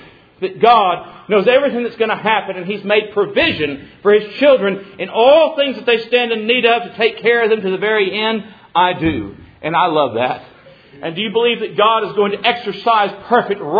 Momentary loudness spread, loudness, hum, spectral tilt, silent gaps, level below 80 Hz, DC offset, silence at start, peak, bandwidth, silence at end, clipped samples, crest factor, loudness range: 11 LU; -15 LUFS; none; -7 dB/octave; none; -52 dBFS; under 0.1%; 0.4 s; 0 dBFS; 5 kHz; 0 s; under 0.1%; 16 dB; 4 LU